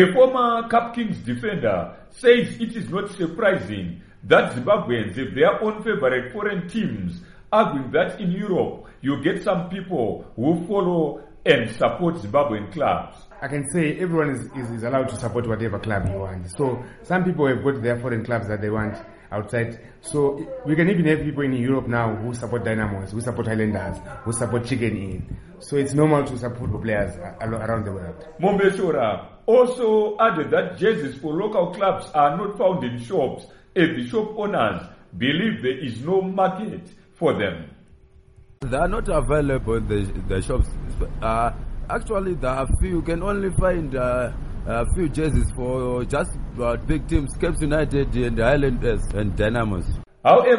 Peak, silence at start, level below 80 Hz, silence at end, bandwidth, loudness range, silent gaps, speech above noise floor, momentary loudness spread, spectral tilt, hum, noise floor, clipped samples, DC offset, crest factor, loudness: 0 dBFS; 0 s; -34 dBFS; 0 s; 11.5 kHz; 4 LU; none; 28 dB; 10 LU; -6.5 dB/octave; none; -50 dBFS; under 0.1%; under 0.1%; 22 dB; -23 LUFS